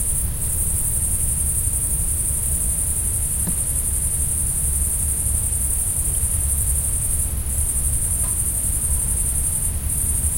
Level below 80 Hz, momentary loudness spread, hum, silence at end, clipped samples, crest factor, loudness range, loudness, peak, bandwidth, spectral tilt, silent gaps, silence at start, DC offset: -26 dBFS; 2 LU; none; 0 s; under 0.1%; 16 dB; 0 LU; -19 LUFS; -6 dBFS; 16.5 kHz; -3 dB/octave; none; 0 s; under 0.1%